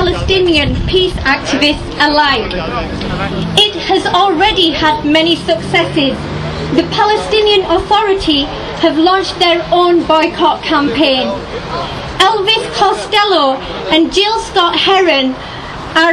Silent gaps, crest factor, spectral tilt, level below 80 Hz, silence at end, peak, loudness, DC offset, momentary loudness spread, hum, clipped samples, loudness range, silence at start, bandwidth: none; 12 dB; -4.5 dB/octave; -30 dBFS; 0 s; 0 dBFS; -11 LUFS; under 0.1%; 9 LU; none; under 0.1%; 1 LU; 0 s; 12.5 kHz